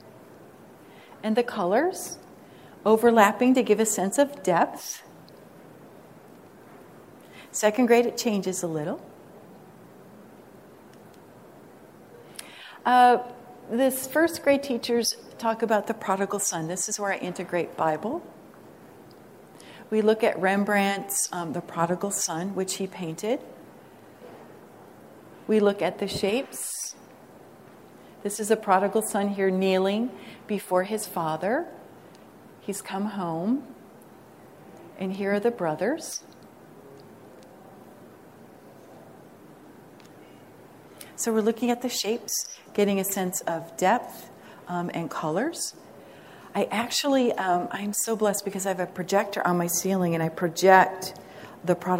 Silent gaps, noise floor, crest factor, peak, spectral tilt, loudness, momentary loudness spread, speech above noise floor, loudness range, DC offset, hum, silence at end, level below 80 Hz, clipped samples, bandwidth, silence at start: none; -50 dBFS; 24 dB; -2 dBFS; -4 dB/octave; -25 LUFS; 17 LU; 25 dB; 9 LU; under 0.1%; none; 0 s; -70 dBFS; under 0.1%; 16 kHz; 0.05 s